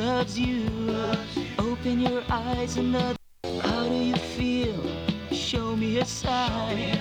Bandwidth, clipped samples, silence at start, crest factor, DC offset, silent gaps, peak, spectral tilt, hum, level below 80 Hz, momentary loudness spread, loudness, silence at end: 13 kHz; under 0.1%; 0 s; 16 dB; under 0.1%; none; -10 dBFS; -5 dB/octave; none; -42 dBFS; 4 LU; -27 LUFS; 0 s